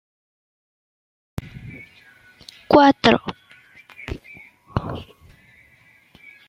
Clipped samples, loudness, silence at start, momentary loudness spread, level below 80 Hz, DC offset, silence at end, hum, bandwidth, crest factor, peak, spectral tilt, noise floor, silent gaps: under 0.1%; -18 LUFS; 1.4 s; 25 LU; -48 dBFS; under 0.1%; 1.45 s; none; 10 kHz; 24 dB; 0 dBFS; -6 dB/octave; -55 dBFS; none